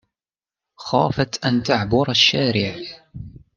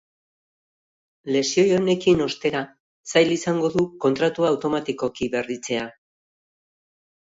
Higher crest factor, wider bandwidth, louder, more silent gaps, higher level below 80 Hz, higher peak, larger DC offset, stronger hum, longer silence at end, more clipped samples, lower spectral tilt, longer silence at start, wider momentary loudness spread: about the same, 18 dB vs 18 dB; about the same, 7.4 kHz vs 8 kHz; first, -19 LUFS vs -22 LUFS; second, none vs 2.80-3.04 s; first, -48 dBFS vs -58 dBFS; first, -2 dBFS vs -6 dBFS; neither; neither; second, 0.2 s vs 1.3 s; neither; about the same, -4.5 dB/octave vs -4.5 dB/octave; second, 0.8 s vs 1.25 s; first, 22 LU vs 9 LU